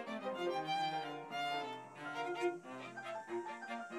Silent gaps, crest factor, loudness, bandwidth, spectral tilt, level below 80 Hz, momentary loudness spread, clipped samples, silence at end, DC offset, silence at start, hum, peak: none; 16 dB; -42 LUFS; 15 kHz; -4.5 dB/octave; under -90 dBFS; 9 LU; under 0.1%; 0 s; under 0.1%; 0 s; none; -26 dBFS